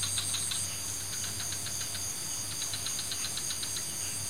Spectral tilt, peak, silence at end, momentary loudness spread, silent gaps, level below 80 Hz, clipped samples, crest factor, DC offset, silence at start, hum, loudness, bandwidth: -0.5 dB/octave; -16 dBFS; 0 s; 3 LU; none; -60 dBFS; under 0.1%; 18 dB; 0.6%; 0 s; none; -32 LUFS; 16 kHz